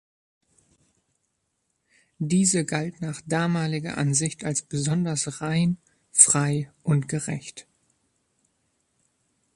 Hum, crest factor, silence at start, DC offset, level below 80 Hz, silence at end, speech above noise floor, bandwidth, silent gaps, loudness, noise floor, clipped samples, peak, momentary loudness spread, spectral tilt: none; 26 dB; 2.2 s; under 0.1%; -62 dBFS; 1.95 s; 52 dB; 11.5 kHz; none; -24 LUFS; -76 dBFS; under 0.1%; 0 dBFS; 16 LU; -4 dB/octave